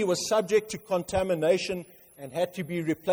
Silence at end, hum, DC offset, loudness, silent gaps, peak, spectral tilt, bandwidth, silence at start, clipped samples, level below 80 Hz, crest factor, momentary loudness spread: 0 s; none; under 0.1%; -28 LUFS; none; -12 dBFS; -4.5 dB/octave; over 20 kHz; 0 s; under 0.1%; -56 dBFS; 16 dB; 10 LU